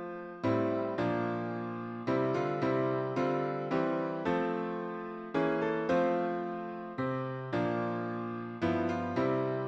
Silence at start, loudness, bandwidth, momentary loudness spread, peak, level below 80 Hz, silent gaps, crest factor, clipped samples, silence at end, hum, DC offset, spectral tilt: 0 s; -33 LUFS; 7.8 kHz; 7 LU; -18 dBFS; -68 dBFS; none; 14 dB; under 0.1%; 0 s; none; under 0.1%; -8 dB/octave